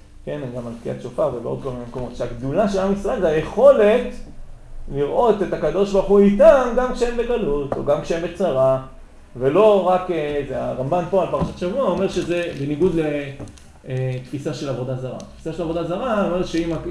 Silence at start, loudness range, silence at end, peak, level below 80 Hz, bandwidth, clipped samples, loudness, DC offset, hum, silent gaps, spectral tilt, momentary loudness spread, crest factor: 0.15 s; 7 LU; 0 s; 0 dBFS; -38 dBFS; 12 kHz; under 0.1%; -20 LUFS; 0.2%; none; none; -7 dB/octave; 15 LU; 18 dB